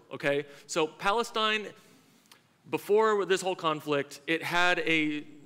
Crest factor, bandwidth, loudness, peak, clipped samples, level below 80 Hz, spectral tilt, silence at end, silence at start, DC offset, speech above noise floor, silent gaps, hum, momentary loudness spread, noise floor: 18 dB; 16 kHz; -28 LUFS; -12 dBFS; under 0.1%; -66 dBFS; -3.5 dB/octave; 0.05 s; 0.1 s; under 0.1%; 32 dB; none; none; 8 LU; -61 dBFS